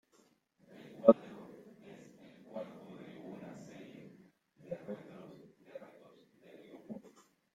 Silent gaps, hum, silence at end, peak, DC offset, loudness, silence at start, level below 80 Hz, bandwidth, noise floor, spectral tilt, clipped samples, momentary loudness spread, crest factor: none; none; 0.55 s; -8 dBFS; under 0.1%; -34 LUFS; 0.75 s; -82 dBFS; 7.8 kHz; -71 dBFS; -8 dB/octave; under 0.1%; 29 LU; 32 dB